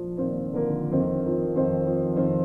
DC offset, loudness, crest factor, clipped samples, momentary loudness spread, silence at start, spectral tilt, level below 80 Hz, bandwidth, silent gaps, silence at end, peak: under 0.1%; -26 LUFS; 12 dB; under 0.1%; 4 LU; 0 s; -12.5 dB/octave; -50 dBFS; 2.8 kHz; none; 0 s; -12 dBFS